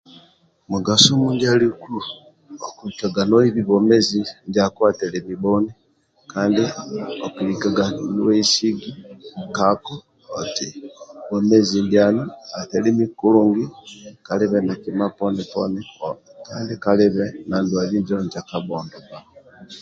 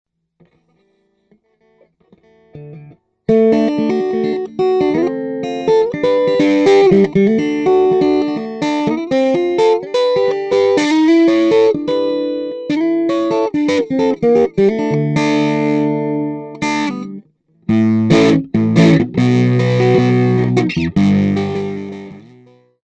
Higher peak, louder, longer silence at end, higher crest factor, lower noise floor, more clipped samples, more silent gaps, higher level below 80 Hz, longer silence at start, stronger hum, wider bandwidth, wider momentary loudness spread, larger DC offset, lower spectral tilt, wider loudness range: about the same, 0 dBFS vs 0 dBFS; second, -19 LUFS vs -14 LUFS; second, 0 s vs 0.65 s; first, 20 dB vs 14 dB; second, -55 dBFS vs -60 dBFS; neither; neither; second, -56 dBFS vs -50 dBFS; second, 0.7 s vs 2.55 s; neither; about the same, 9.2 kHz vs 9.2 kHz; first, 19 LU vs 10 LU; neither; second, -5 dB/octave vs -7 dB/octave; about the same, 4 LU vs 4 LU